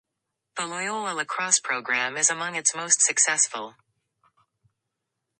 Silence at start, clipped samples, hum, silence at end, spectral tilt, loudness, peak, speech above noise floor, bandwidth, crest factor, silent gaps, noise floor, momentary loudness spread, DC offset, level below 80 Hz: 0.55 s; under 0.1%; none; 1.7 s; 0.5 dB/octave; -23 LUFS; -4 dBFS; 57 dB; 11.5 kHz; 24 dB; none; -83 dBFS; 13 LU; under 0.1%; -82 dBFS